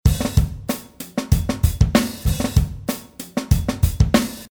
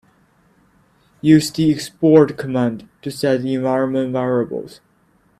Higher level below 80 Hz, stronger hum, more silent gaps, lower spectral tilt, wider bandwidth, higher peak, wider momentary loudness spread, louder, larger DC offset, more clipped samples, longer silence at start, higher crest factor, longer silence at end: first, -24 dBFS vs -56 dBFS; neither; neither; about the same, -6 dB/octave vs -6.5 dB/octave; first, over 20 kHz vs 14.5 kHz; about the same, -2 dBFS vs 0 dBFS; second, 10 LU vs 14 LU; second, -21 LUFS vs -17 LUFS; neither; neither; second, 0.05 s vs 1.25 s; about the same, 16 dB vs 18 dB; second, 0.05 s vs 0.7 s